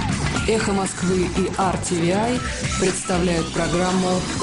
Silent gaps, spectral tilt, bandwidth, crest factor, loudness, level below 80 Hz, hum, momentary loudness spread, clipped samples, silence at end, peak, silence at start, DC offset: none; -4.5 dB/octave; 11 kHz; 14 dB; -21 LUFS; -34 dBFS; none; 2 LU; under 0.1%; 0 s; -8 dBFS; 0 s; under 0.1%